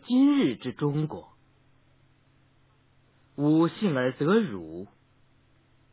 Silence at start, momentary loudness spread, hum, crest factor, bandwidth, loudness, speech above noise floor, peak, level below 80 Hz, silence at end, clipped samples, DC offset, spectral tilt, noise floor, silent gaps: 0.05 s; 21 LU; none; 16 dB; 4 kHz; -26 LUFS; 38 dB; -12 dBFS; -66 dBFS; 1.05 s; under 0.1%; under 0.1%; -6.5 dB/octave; -63 dBFS; none